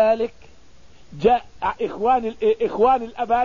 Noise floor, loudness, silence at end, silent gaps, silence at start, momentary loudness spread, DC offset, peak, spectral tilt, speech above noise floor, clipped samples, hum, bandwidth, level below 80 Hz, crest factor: -51 dBFS; -21 LUFS; 0 s; none; 0 s; 7 LU; 0.6%; -4 dBFS; -6.5 dB/octave; 31 dB; under 0.1%; none; 7.2 kHz; -48 dBFS; 16 dB